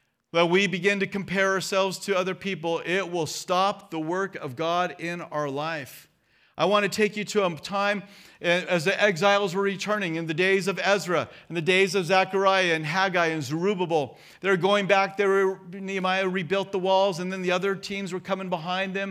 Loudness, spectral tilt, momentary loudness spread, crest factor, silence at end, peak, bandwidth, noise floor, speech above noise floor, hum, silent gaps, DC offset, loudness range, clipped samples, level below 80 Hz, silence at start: -25 LUFS; -4.5 dB/octave; 9 LU; 18 dB; 0 s; -6 dBFS; 15.5 kHz; -60 dBFS; 35 dB; none; none; under 0.1%; 4 LU; under 0.1%; -72 dBFS; 0.35 s